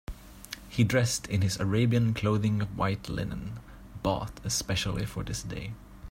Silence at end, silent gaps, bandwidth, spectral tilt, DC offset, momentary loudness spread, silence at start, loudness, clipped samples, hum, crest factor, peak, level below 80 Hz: 0 s; none; 16.5 kHz; -5 dB/octave; under 0.1%; 17 LU; 0.1 s; -29 LUFS; under 0.1%; none; 18 dB; -12 dBFS; -46 dBFS